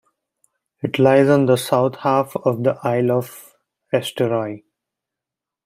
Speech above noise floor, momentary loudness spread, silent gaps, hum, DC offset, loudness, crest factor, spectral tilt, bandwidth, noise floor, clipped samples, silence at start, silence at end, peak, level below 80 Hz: 69 dB; 12 LU; none; none; under 0.1%; -18 LUFS; 18 dB; -6.5 dB/octave; 16 kHz; -86 dBFS; under 0.1%; 0.85 s; 1.1 s; -2 dBFS; -66 dBFS